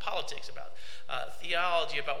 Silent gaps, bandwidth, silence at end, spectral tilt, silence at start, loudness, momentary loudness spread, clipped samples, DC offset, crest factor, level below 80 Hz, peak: none; 17 kHz; 0 s; -2 dB/octave; 0 s; -33 LUFS; 19 LU; under 0.1%; 3%; 18 dB; -62 dBFS; -14 dBFS